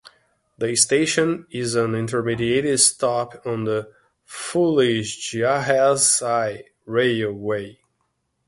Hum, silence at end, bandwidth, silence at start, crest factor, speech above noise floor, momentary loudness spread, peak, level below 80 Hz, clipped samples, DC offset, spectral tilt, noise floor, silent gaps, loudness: none; 0.75 s; 12 kHz; 0.05 s; 20 dB; 51 dB; 11 LU; -2 dBFS; -58 dBFS; under 0.1%; under 0.1%; -3.5 dB/octave; -72 dBFS; none; -20 LUFS